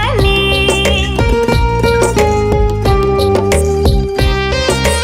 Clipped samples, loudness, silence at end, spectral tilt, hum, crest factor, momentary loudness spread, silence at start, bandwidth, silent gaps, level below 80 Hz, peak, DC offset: under 0.1%; -12 LUFS; 0 s; -5 dB/octave; none; 10 dB; 3 LU; 0 s; 16.5 kHz; none; -18 dBFS; 0 dBFS; under 0.1%